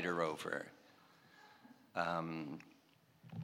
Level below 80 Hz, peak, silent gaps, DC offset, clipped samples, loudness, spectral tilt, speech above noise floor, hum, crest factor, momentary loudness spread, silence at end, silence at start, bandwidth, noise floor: -82 dBFS; -22 dBFS; none; under 0.1%; under 0.1%; -42 LUFS; -5.5 dB/octave; 29 dB; none; 22 dB; 24 LU; 0 s; 0 s; 18.5 kHz; -70 dBFS